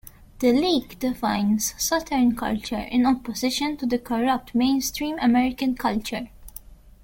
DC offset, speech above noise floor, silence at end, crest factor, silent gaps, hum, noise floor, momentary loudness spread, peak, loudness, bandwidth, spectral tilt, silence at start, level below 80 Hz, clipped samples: under 0.1%; 22 dB; 0.15 s; 16 dB; none; none; -44 dBFS; 8 LU; -8 dBFS; -23 LUFS; 17 kHz; -3.5 dB/octave; 0.05 s; -46 dBFS; under 0.1%